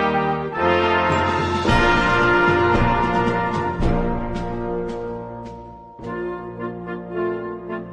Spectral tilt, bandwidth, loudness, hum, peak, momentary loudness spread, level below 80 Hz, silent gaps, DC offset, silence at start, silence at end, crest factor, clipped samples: -6.5 dB/octave; 10.5 kHz; -20 LUFS; none; -4 dBFS; 15 LU; -32 dBFS; none; under 0.1%; 0 s; 0 s; 16 dB; under 0.1%